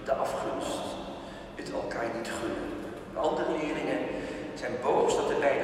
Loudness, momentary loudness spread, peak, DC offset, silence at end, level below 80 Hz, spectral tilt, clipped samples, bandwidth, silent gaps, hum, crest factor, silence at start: -32 LUFS; 12 LU; -14 dBFS; under 0.1%; 0 s; -56 dBFS; -4.5 dB/octave; under 0.1%; 13.5 kHz; none; none; 18 dB; 0 s